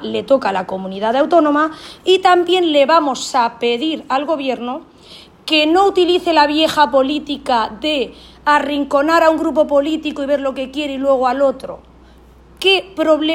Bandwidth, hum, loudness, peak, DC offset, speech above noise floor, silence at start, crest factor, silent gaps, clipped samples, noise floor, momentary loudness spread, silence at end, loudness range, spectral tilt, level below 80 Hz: 16 kHz; none; -15 LUFS; 0 dBFS; under 0.1%; 29 dB; 0 s; 16 dB; none; under 0.1%; -44 dBFS; 9 LU; 0 s; 3 LU; -3.5 dB/octave; -50 dBFS